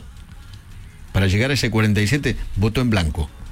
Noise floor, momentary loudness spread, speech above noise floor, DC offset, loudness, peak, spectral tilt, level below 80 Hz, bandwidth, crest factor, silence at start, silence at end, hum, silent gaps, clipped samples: -39 dBFS; 8 LU; 20 dB; under 0.1%; -20 LUFS; -8 dBFS; -5.5 dB/octave; -32 dBFS; 16 kHz; 12 dB; 0 s; 0 s; none; none; under 0.1%